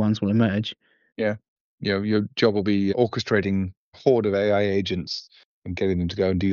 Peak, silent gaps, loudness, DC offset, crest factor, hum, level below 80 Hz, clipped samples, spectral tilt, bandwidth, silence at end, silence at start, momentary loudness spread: -6 dBFS; 1.48-1.78 s, 3.77-3.92 s, 5.45-5.62 s; -24 LUFS; under 0.1%; 18 dB; none; -52 dBFS; under 0.1%; -5.5 dB/octave; 7.2 kHz; 0 s; 0 s; 11 LU